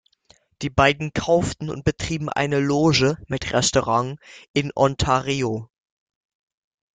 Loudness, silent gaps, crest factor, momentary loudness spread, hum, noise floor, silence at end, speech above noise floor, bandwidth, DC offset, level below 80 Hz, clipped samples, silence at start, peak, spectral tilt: -21 LUFS; 4.49-4.54 s; 20 dB; 9 LU; none; -58 dBFS; 1.3 s; 37 dB; 9.6 kHz; under 0.1%; -44 dBFS; under 0.1%; 0.6 s; -2 dBFS; -4.5 dB/octave